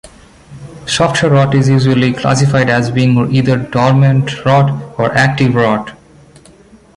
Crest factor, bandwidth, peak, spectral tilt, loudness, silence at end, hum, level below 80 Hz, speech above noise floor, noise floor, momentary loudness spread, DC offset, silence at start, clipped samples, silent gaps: 12 dB; 11.5 kHz; 0 dBFS; -6 dB/octave; -12 LUFS; 1 s; none; -42 dBFS; 31 dB; -42 dBFS; 5 LU; under 0.1%; 0.05 s; under 0.1%; none